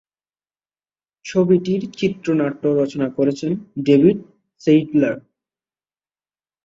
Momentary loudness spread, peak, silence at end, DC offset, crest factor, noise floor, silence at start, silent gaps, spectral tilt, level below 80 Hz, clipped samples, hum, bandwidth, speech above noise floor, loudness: 10 LU; -2 dBFS; 1.45 s; under 0.1%; 18 dB; under -90 dBFS; 1.25 s; none; -7.5 dB/octave; -60 dBFS; under 0.1%; 50 Hz at -55 dBFS; 7.6 kHz; over 73 dB; -19 LUFS